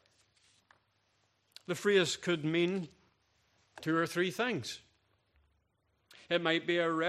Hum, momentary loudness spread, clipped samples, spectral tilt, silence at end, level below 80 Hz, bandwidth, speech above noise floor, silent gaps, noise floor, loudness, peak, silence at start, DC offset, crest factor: none; 14 LU; under 0.1%; -4.5 dB/octave; 0 s; -78 dBFS; 14.5 kHz; 45 dB; none; -77 dBFS; -32 LUFS; -14 dBFS; 1.7 s; under 0.1%; 22 dB